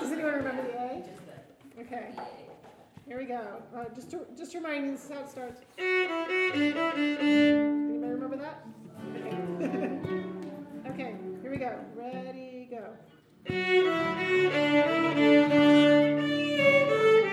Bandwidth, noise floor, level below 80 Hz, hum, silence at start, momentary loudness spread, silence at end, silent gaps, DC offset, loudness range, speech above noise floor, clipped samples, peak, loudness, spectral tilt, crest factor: 12 kHz; -51 dBFS; -70 dBFS; none; 0 s; 20 LU; 0 s; none; under 0.1%; 16 LU; 22 dB; under 0.1%; -10 dBFS; -27 LUFS; -6 dB/octave; 18 dB